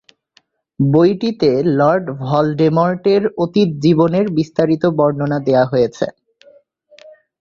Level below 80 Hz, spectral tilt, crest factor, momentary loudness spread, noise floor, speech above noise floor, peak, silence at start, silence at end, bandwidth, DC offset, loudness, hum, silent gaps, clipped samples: -54 dBFS; -8 dB/octave; 14 dB; 6 LU; -58 dBFS; 43 dB; -2 dBFS; 0.8 s; 1.3 s; 7.4 kHz; under 0.1%; -15 LUFS; none; none; under 0.1%